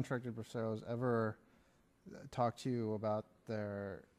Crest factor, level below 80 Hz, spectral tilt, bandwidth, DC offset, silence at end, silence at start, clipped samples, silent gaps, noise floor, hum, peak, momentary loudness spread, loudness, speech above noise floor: 18 dB; -74 dBFS; -7.5 dB/octave; 14 kHz; under 0.1%; 0.15 s; 0 s; under 0.1%; none; -71 dBFS; none; -24 dBFS; 10 LU; -40 LUFS; 31 dB